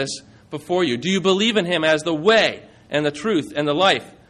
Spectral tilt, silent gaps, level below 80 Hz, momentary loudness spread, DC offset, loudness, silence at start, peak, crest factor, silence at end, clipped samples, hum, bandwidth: -4 dB/octave; none; -58 dBFS; 12 LU; under 0.1%; -19 LUFS; 0 s; -4 dBFS; 16 dB; 0.2 s; under 0.1%; none; 12 kHz